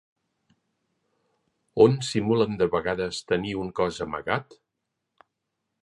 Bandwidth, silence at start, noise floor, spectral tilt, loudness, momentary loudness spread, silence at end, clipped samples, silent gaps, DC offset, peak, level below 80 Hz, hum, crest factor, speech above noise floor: 11.5 kHz; 1.75 s; -82 dBFS; -6 dB/octave; -25 LUFS; 10 LU; 1.4 s; under 0.1%; none; under 0.1%; -4 dBFS; -56 dBFS; none; 24 dB; 58 dB